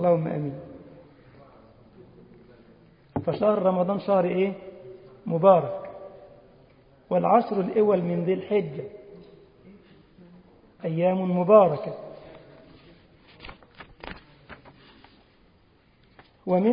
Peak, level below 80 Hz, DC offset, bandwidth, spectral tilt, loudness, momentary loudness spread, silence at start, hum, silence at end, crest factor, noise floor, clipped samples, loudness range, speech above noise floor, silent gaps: -4 dBFS; -60 dBFS; under 0.1%; 5.2 kHz; -12 dB/octave; -24 LUFS; 26 LU; 0 s; none; 0 s; 24 dB; -60 dBFS; under 0.1%; 8 LU; 38 dB; none